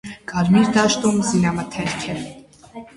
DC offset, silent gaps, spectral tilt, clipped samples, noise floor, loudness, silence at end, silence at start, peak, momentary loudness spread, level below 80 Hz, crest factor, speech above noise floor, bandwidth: under 0.1%; none; -5 dB/octave; under 0.1%; -40 dBFS; -19 LUFS; 0.15 s; 0.05 s; -4 dBFS; 15 LU; -48 dBFS; 16 dB; 22 dB; 11.5 kHz